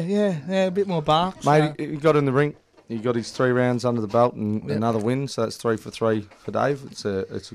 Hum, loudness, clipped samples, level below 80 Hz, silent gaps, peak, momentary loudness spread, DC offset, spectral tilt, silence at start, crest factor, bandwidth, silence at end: none; -23 LUFS; under 0.1%; -58 dBFS; none; -6 dBFS; 8 LU; under 0.1%; -6.5 dB/octave; 0 s; 16 dB; 14 kHz; 0 s